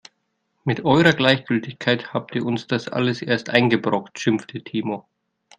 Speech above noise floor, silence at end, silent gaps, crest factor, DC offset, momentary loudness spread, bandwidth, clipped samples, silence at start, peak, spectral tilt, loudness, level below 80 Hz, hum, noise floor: 52 dB; 0.6 s; none; 22 dB; under 0.1%; 11 LU; 10 kHz; under 0.1%; 0.65 s; 0 dBFS; -6 dB/octave; -21 LUFS; -60 dBFS; none; -72 dBFS